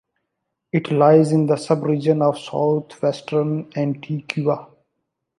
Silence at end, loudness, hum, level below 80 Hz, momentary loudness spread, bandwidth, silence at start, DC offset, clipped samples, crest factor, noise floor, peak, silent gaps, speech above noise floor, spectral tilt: 0.75 s; -20 LUFS; none; -68 dBFS; 10 LU; 11 kHz; 0.75 s; under 0.1%; under 0.1%; 18 dB; -78 dBFS; -2 dBFS; none; 59 dB; -7.5 dB/octave